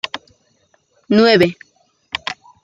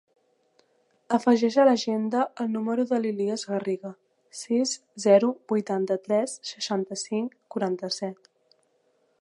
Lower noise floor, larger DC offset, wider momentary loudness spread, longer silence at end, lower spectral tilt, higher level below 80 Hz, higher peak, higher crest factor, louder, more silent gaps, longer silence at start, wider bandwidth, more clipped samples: second, -60 dBFS vs -69 dBFS; neither; first, 16 LU vs 12 LU; second, 0.3 s vs 1.05 s; about the same, -5.5 dB/octave vs -4.5 dB/octave; first, -58 dBFS vs -82 dBFS; first, 0 dBFS vs -8 dBFS; about the same, 18 dB vs 20 dB; first, -16 LUFS vs -26 LUFS; neither; second, 0.15 s vs 1.1 s; about the same, 12 kHz vs 11.5 kHz; neither